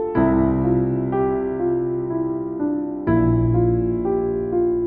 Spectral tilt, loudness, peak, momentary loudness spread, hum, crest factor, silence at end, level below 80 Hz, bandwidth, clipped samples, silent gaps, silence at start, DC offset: -14 dB/octave; -21 LUFS; -6 dBFS; 6 LU; none; 14 dB; 0 s; -36 dBFS; 3.2 kHz; under 0.1%; none; 0 s; under 0.1%